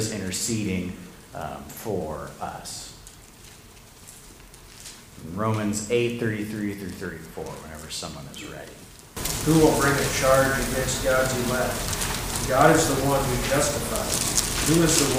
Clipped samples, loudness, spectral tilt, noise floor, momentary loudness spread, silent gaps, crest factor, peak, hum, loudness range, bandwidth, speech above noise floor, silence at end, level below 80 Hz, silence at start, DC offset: under 0.1%; -23 LUFS; -4 dB/octave; -48 dBFS; 21 LU; none; 22 dB; -2 dBFS; none; 14 LU; 16 kHz; 23 dB; 0 s; -40 dBFS; 0 s; under 0.1%